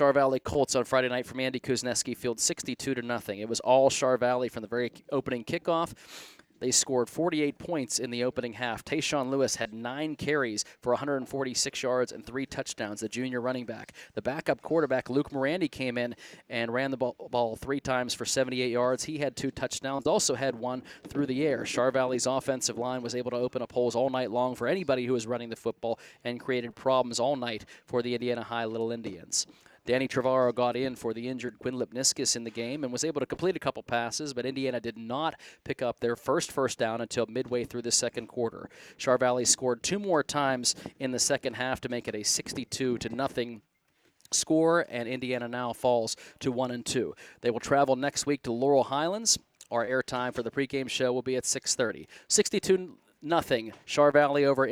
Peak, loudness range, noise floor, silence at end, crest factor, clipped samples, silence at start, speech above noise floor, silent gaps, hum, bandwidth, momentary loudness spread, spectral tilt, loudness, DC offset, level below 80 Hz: -10 dBFS; 4 LU; -70 dBFS; 0 s; 20 dB; under 0.1%; 0 s; 41 dB; none; none; 17 kHz; 10 LU; -3 dB/octave; -29 LUFS; under 0.1%; -62 dBFS